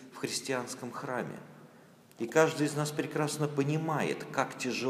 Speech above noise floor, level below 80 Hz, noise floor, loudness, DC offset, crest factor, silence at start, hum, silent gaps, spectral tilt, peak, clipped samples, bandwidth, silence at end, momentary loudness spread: 25 dB; -80 dBFS; -57 dBFS; -32 LUFS; under 0.1%; 24 dB; 0 s; none; none; -5 dB/octave; -10 dBFS; under 0.1%; 15.5 kHz; 0 s; 12 LU